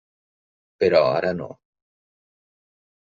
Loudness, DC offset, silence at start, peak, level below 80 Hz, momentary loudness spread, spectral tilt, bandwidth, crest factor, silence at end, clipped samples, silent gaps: -20 LUFS; under 0.1%; 0.8 s; -4 dBFS; -66 dBFS; 15 LU; -4 dB/octave; 7.2 kHz; 22 dB; 1.7 s; under 0.1%; none